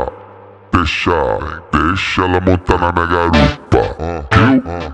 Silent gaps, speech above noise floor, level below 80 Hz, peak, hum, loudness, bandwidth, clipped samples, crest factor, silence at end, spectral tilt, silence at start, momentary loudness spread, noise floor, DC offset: none; 24 dB; -26 dBFS; 0 dBFS; none; -14 LUFS; 9.6 kHz; under 0.1%; 14 dB; 0 s; -6.5 dB/octave; 0 s; 7 LU; -38 dBFS; under 0.1%